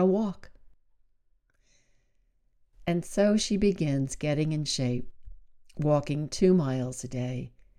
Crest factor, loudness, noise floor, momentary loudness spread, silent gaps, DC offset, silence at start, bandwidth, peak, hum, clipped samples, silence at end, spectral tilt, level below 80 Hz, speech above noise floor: 18 dB; -28 LUFS; -68 dBFS; 11 LU; none; under 0.1%; 0 s; 13 kHz; -10 dBFS; none; under 0.1%; 0.3 s; -6 dB/octave; -50 dBFS; 41 dB